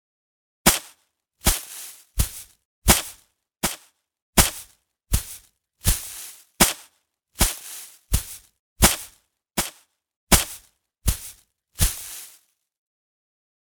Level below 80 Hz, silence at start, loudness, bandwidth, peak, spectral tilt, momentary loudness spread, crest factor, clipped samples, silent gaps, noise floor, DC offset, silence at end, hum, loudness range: -32 dBFS; 0.65 s; -23 LUFS; over 20 kHz; 0 dBFS; -2.5 dB/octave; 20 LU; 26 dB; under 0.1%; 2.65-2.82 s, 4.22-4.33 s, 8.59-8.76 s, 10.16-10.27 s; -65 dBFS; under 0.1%; 1.45 s; none; 2 LU